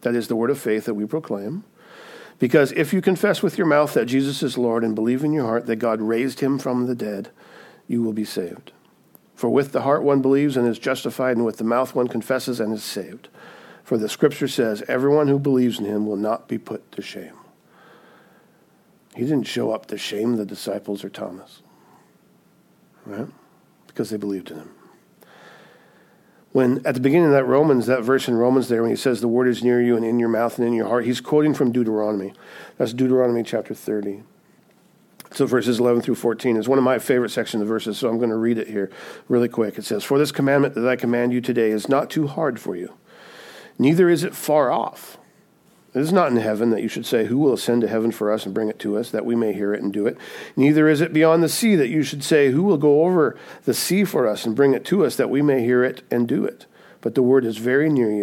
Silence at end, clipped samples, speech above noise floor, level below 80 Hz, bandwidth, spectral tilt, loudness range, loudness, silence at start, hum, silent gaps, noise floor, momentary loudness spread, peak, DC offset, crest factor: 0 s; under 0.1%; 37 dB; -74 dBFS; 17 kHz; -6 dB/octave; 10 LU; -21 LUFS; 0 s; none; none; -57 dBFS; 12 LU; -2 dBFS; under 0.1%; 18 dB